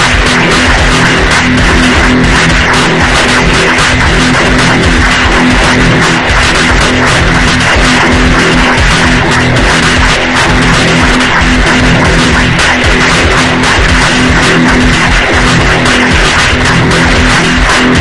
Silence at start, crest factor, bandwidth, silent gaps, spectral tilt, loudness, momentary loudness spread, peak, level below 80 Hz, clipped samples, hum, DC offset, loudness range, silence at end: 0 s; 6 dB; 12 kHz; none; -4 dB/octave; -6 LUFS; 1 LU; 0 dBFS; -14 dBFS; 3%; none; under 0.1%; 0 LU; 0 s